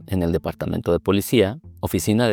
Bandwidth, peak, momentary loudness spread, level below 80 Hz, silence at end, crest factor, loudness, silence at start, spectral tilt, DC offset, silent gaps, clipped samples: over 20 kHz; -4 dBFS; 7 LU; -46 dBFS; 0 s; 16 dB; -22 LUFS; 0 s; -6 dB/octave; under 0.1%; none; under 0.1%